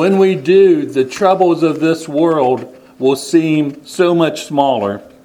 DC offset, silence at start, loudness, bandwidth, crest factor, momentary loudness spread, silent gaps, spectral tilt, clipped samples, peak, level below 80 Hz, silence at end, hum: under 0.1%; 0 s; -14 LUFS; 14 kHz; 14 dB; 8 LU; none; -6 dB/octave; under 0.1%; 0 dBFS; -60 dBFS; 0.2 s; none